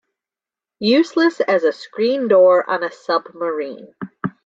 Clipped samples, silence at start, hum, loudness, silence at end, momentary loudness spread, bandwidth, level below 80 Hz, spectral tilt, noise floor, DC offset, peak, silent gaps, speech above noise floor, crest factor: under 0.1%; 0.8 s; none; -17 LUFS; 0.15 s; 15 LU; 7.6 kHz; -66 dBFS; -6 dB/octave; -89 dBFS; under 0.1%; -2 dBFS; none; 72 dB; 16 dB